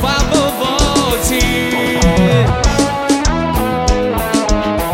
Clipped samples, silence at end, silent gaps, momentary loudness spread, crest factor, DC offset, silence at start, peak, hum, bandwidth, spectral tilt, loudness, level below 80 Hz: under 0.1%; 0 s; none; 4 LU; 12 dB; under 0.1%; 0 s; -2 dBFS; none; 16.5 kHz; -4.5 dB/octave; -14 LUFS; -20 dBFS